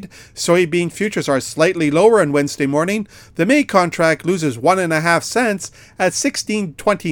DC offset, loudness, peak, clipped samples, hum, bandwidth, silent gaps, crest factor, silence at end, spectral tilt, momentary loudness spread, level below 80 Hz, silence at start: under 0.1%; -17 LUFS; 0 dBFS; under 0.1%; none; 18.5 kHz; none; 16 dB; 0 s; -4.5 dB/octave; 8 LU; -52 dBFS; 0 s